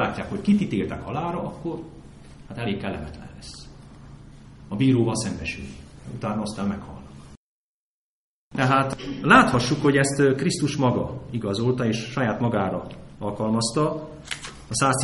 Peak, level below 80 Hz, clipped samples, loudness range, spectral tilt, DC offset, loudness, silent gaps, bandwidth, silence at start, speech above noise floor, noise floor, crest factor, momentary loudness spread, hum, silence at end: -2 dBFS; -48 dBFS; under 0.1%; 12 LU; -5.5 dB/octave; under 0.1%; -24 LUFS; 7.37-8.51 s; 11.5 kHz; 0 s; 21 dB; -45 dBFS; 22 dB; 19 LU; none; 0 s